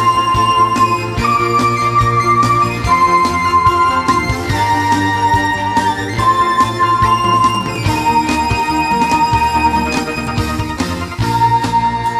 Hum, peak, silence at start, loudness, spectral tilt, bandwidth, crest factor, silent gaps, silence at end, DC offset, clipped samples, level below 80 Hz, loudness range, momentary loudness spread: none; 0 dBFS; 0 s; -13 LUFS; -5 dB/octave; 15.5 kHz; 12 dB; none; 0 s; under 0.1%; under 0.1%; -32 dBFS; 2 LU; 5 LU